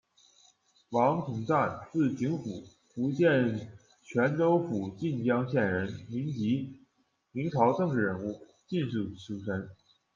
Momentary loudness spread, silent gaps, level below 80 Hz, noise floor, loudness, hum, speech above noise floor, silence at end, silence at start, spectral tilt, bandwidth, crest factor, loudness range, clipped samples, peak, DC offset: 13 LU; none; -68 dBFS; -74 dBFS; -30 LUFS; none; 44 dB; 0.4 s; 0.9 s; -8 dB/octave; 7.4 kHz; 18 dB; 3 LU; under 0.1%; -12 dBFS; under 0.1%